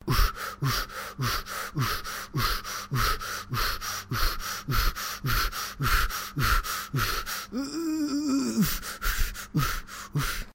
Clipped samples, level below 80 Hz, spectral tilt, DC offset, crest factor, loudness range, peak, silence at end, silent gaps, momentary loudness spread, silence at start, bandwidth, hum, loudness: under 0.1%; -34 dBFS; -3.5 dB/octave; under 0.1%; 18 dB; 2 LU; -10 dBFS; 0.05 s; none; 6 LU; 0 s; 16 kHz; none; -29 LUFS